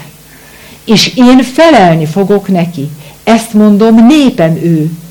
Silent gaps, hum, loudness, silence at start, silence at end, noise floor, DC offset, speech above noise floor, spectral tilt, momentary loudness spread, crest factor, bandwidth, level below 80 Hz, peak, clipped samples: none; none; -7 LUFS; 0 s; 0.05 s; -34 dBFS; under 0.1%; 28 dB; -6 dB/octave; 11 LU; 8 dB; 19 kHz; -40 dBFS; 0 dBFS; 4%